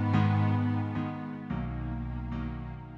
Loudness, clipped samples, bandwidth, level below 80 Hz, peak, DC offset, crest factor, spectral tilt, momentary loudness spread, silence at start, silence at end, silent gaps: -32 LUFS; under 0.1%; 5.8 kHz; -44 dBFS; -14 dBFS; under 0.1%; 16 dB; -9.5 dB/octave; 11 LU; 0 s; 0 s; none